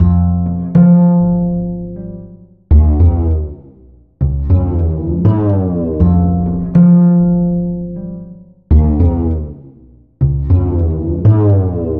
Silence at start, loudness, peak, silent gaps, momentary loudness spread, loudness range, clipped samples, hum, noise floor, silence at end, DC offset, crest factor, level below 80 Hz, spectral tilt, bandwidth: 0 s; -13 LUFS; -2 dBFS; none; 15 LU; 4 LU; under 0.1%; none; -43 dBFS; 0 s; under 0.1%; 10 dB; -20 dBFS; -13.5 dB/octave; 2.2 kHz